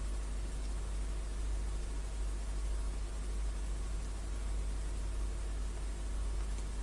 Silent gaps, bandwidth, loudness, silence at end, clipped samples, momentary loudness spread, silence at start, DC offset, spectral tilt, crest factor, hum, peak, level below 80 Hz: none; 11.5 kHz; -41 LUFS; 0 s; under 0.1%; 2 LU; 0 s; under 0.1%; -5 dB/octave; 10 dB; none; -28 dBFS; -38 dBFS